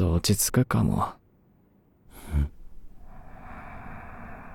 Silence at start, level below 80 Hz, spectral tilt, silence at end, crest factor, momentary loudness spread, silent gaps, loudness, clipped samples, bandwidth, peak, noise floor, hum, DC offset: 0 s; -38 dBFS; -5 dB/octave; 0 s; 20 dB; 23 LU; none; -26 LUFS; under 0.1%; 19 kHz; -10 dBFS; -61 dBFS; none; under 0.1%